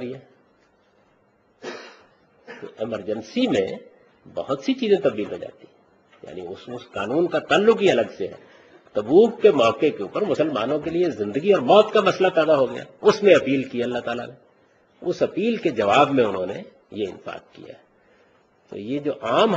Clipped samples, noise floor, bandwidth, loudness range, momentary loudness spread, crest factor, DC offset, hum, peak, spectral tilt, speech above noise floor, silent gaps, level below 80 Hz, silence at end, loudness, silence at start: under 0.1%; -61 dBFS; 8 kHz; 10 LU; 20 LU; 22 dB; under 0.1%; none; 0 dBFS; -5.5 dB/octave; 40 dB; none; -64 dBFS; 0 s; -21 LUFS; 0 s